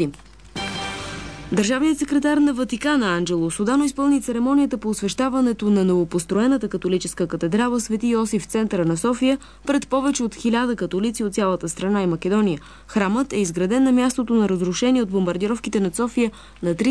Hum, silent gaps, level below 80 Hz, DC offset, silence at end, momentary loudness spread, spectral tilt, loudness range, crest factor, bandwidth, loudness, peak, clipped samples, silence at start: none; none; -48 dBFS; 0.2%; 0 s; 6 LU; -5 dB/octave; 2 LU; 14 dB; 11 kHz; -21 LUFS; -6 dBFS; under 0.1%; 0 s